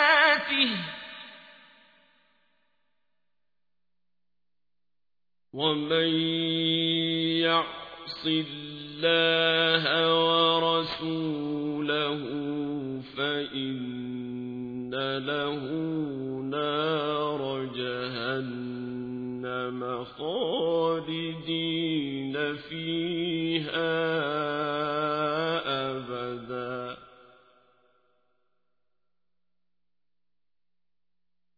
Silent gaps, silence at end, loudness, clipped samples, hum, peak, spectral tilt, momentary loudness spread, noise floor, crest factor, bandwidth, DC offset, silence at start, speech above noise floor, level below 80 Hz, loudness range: none; 4.5 s; -28 LUFS; under 0.1%; 60 Hz at -75 dBFS; -8 dBFS; -7 dB/octave; 13 LU; under -90 dBFS; 22 dB; 5 kHz; under 0.1%; 0 s; over 63 dB; -68 dBFS; 9 LU